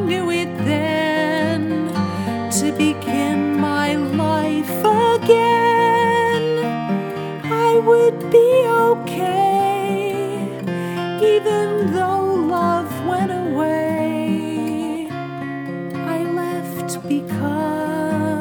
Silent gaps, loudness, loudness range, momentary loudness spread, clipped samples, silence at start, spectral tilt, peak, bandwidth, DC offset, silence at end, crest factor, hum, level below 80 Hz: none; -19 LUFS; 7 LU; 10 LU; under 0.1%; 0 s; -5.5 dB/octave; 0 dBFS; over 20 kHz; under 0.1%; 0 s; 18 dB; none; -66 dBFS